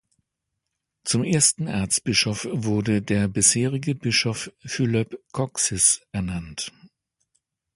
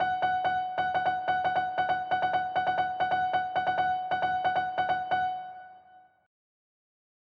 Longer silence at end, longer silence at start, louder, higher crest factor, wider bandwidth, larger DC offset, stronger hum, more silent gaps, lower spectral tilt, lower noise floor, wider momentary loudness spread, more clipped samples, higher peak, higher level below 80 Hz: second, 0.9 s vs 1.25 s; first, 1.05 s vs 0 s; first, -22 LUFS vs -29 LUFS; first, 22 dB vs 12 dB; first, 11.5 kHz vs 6.6 kHz; neither; neither; neither; second, -3.5 dB/octave vs -5.5 dB/octave; first, -81 dBFS vs -57 dBFS; first, 13 LU vs 2 LU; neither; first, -2 dBFS vs -16 dBFS; first, -50 dBFS vs -66 dBFS